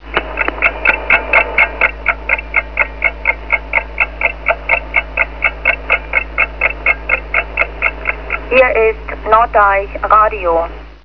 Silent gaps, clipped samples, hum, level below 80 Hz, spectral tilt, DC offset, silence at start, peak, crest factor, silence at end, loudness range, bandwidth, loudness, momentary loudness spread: none; under 0.1%; none; -28 dBFS; -6.5 dB/octave; 1%; 0 s; 0 dBFS; 14 dB; 0.1 s; 2 LU; 5.4 kHz; -13 LUFS; 7 LU